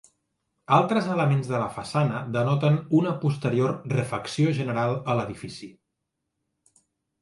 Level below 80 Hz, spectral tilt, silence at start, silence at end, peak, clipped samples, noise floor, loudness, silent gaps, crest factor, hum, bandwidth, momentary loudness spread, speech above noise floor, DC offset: -62 dBFS; -7.5 dB/octave; 0.7 s; 1.5 s; -6 dBFS; under 0.1%; -81 dBFS; -25 LUFS; none; 18 dB; none; 11.5 kHz; 7 LU; 57 dB; under 0.1%